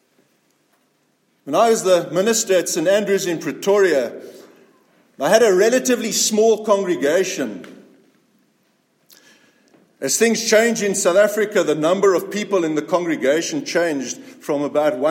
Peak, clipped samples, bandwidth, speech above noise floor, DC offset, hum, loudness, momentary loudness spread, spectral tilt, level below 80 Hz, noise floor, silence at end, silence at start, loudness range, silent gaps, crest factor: -2 dBFS; under 0.1%; 16.5 kHz; 46 dB; under 0.1%; none; -18 LUFS; 9 LU; -3 dB/octave; -74 dBFS; -64 dBFS; 0 s; 1.45 s; 5 LU; none; 18 dB